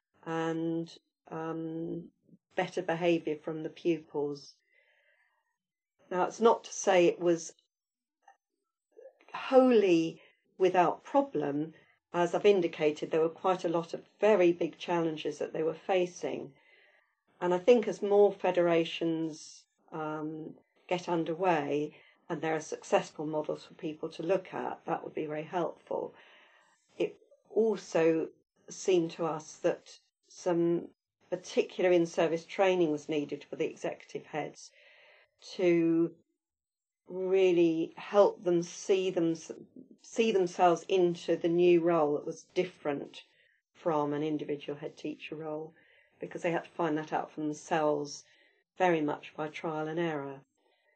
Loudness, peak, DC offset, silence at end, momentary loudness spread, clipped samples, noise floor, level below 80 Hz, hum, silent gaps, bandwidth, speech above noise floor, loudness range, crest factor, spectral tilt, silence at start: -31 LUFS; -10 dBFS; under 0.1%; 0.55 s; 15 LU; under 0.1%; under -90 dBFS; -86 dBFS; none; none; 8.8 kHz; over 60 dB; 7 LU; 20 dB; -5.5 dB/octave; 0.25 s